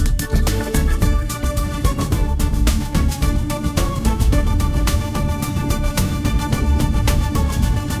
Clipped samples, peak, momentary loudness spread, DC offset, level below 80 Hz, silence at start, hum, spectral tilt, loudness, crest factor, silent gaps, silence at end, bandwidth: under 0.1%; -4 dBFS; 3 LU; 0.4%; -18 dBFS; 0 s; none; -5.5 dB/octave; -20 LUFS; 14 dB; none; 0 s; 16 kHz